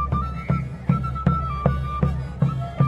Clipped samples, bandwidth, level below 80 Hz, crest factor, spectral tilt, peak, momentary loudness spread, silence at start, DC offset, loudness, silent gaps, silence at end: under 0.1%; 5.4 kHz; -32 dBFS; 18 dB; -9.5 dB/octave; -4 dBFS; 3 LU; 0 s; under 0.1%; -24 LUFS; none; 0 s